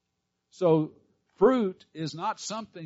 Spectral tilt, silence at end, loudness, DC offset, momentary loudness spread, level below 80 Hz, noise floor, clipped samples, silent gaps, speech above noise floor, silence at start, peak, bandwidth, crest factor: -6 dB/octave; 0 s; -28 LUFS; under 0.1%; 13 LU; -64 dBFS; -81 dBFS; under 0.1%; none; 54 dB; 0.6 s; -10 dBFS; 8 kHz; 18 dB